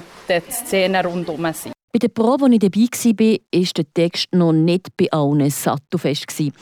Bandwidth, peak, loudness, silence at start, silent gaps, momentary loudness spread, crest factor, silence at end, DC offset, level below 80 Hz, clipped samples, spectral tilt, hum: over 20 kHz; -6 dBFS; -18 LUFS; 0 s; 1.83-1.88 s; 8 LU; 12 dB; 0.1 s; under 0.1%; -62 dBFS; under 0.1%; -5.5 dB/octave; none